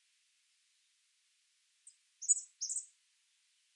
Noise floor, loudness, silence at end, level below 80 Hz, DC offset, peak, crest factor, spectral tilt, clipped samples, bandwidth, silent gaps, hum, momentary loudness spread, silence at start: -76 dBFS; -35 LUFS; 0.9 s; under -90 dBFS; under 0.1%; -16 dBFS; 28 dB; 9.5 dB/octave; under 0.1%; 11.5 kHz; none; none; 11 LU; 2.2 s